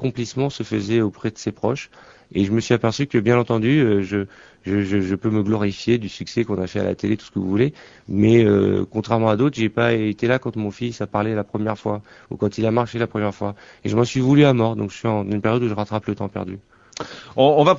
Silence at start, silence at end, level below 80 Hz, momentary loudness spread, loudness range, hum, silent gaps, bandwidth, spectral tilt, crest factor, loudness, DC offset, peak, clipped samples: 0 s; 0 s; -52 dBFS; 12 LU; 4 LU; none; none; 7.8 kHz; -7 dB/octave; 18 dB; -21 LUFS; under 0.1%; -2 dBFS; under 0.1%